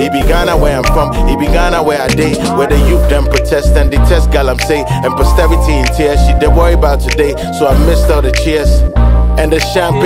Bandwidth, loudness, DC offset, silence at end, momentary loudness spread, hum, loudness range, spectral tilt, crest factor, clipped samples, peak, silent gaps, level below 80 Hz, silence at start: 15.5 kHz; -11 LUFS; 0.7%; 0 s; 3 LU; none; 1 LU; -6 dB/octave; 8 dB; under 0.1%; 0 dBFS; none; -12 dBFS; 0 s